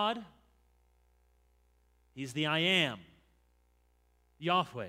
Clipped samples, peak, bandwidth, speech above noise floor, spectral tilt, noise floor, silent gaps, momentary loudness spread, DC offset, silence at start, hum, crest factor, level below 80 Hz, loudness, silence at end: under 0.1%; -12 dBFS; 16 kHz; 38 dB; -4.5 dB/octave; -70 dBFS; none; 16 LU; under 0.1%; 0 s; 60 Hz at -70 dBFS; 24 dB; -70 dBFS; -31 LUFS; 0 s